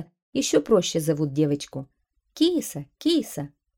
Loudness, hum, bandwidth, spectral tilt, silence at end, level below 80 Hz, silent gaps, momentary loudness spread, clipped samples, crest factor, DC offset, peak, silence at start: -24 LUFS; none; 18 kHz; -5 dB/octave; 0.3 s; -60 dBFS; 0.22-0.33 s; 14 LU; under 0.1%; 18 dB; under 0.1%; -6 dBFS; 0 s